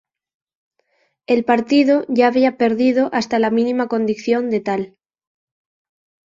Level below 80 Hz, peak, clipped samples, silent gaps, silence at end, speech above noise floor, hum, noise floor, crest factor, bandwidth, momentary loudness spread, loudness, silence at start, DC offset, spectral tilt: -62 dBFS; -2 dBFS; under 0.1%; none; 1.4 s; 49 dB; none; -65 dBFS; 16 dB; 7.6 kHz; 6 LU; -17 LUFS; 1.3 s; under 0.1%; -6 dB/octave